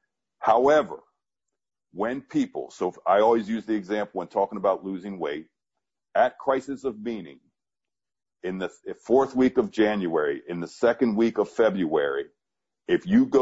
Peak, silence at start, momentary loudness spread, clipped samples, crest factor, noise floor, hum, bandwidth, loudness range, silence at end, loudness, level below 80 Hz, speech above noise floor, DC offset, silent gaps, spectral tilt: -8 dBFS; 0.4 s; 14 LU; under 0.1%; 18 dB; under -90 dBFS; none; 8 kHz; 6 LU; 0 s; -25 LUFS; -62 dBFS; over 66 dB; under 0.1%; none; -6.5 dB/octave